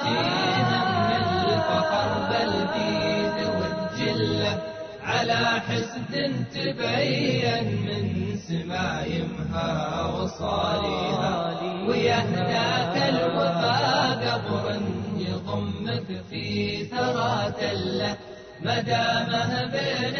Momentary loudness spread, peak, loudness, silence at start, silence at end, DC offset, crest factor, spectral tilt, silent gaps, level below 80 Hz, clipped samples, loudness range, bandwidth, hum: 7 LU; -10 dBFS; -25 LUFS; 0 s; 0 s; under 0.1%; 14 dB; -5.5 dB/octave; none; -52 dBFS; under 0.1%; 4 LU; 6.6 kHz; none